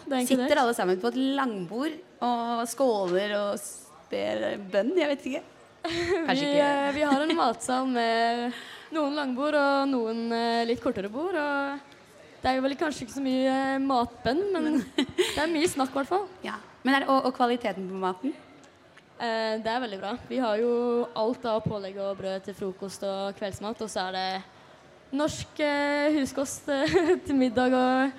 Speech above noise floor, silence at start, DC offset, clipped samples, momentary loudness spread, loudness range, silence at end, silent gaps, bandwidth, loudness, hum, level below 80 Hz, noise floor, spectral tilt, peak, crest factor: 28 dB; 0 s; under 0.1%; under 0.1%; 11 LU; 5 LU; 0 s; none; 15.5 kHz; -27 LUFS; none; -62 dBFS; -55 dBFS; -4 dB/octave; -10 dBFS; 18 dB